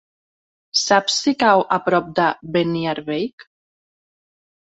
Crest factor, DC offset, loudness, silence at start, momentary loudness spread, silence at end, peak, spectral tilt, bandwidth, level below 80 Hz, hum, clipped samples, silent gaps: 20 dB; under 0.1%; -19 LUFS; 0.75 s; 9 LU; 1.25 s; -2 dBFS; -3.5 dB/octave; 8.2 kHz; -60 dBFS; none; under 0.1%; 3.33-3.38 s